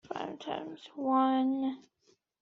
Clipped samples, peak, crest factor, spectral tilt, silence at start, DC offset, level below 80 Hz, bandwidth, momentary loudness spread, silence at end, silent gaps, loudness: under 0.1%; -18 dBFS; 16 dB; -3.5 dB/octave; 0.05 s; under 0.1%; -80 dBFS; 6.8 kHz; 14 LU; 0.6 s; none; -32 LUFS